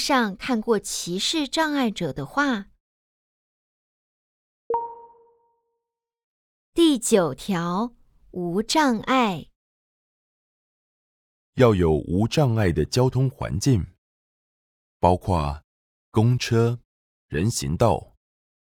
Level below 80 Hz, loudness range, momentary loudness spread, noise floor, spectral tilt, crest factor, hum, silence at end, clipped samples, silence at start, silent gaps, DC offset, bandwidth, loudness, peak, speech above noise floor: -46 dBFS; 9 LU; 10 LU; -84 dBFS; -5.5 dB/octave; 20 dB; none; 0.6 s; under 0.1%; 0 s; 2.80-4.70 s, 6.24-6.73 s, 9.56-11.53 s, 13.98-15.00 s, 15.64-16.12 s, 16.85-17.28 s; under 0.1%; 19 kHz; -23 LUFS; -4 dBFS; 62 dB